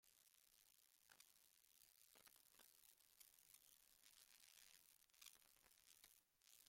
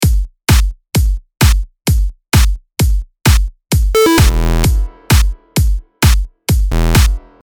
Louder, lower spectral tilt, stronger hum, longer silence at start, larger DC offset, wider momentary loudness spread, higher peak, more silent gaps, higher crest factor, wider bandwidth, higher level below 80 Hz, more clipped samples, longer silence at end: second, -69 LUFS vs -14 LUFS; second, 1 dB/octave vs -5 dB/octave; neither; about the same, 0 s vs 0 s; neither; second, 3 LU vs 6 LU; second, -46 dBFS vs 0 dBFS; neither; first, 28 dB vs 12 dB; second, 16.5 kHz vs over 20 kHz; second, under -90 dBFS vs -14 dBFS; neither; second, 0 s vs 0.25 s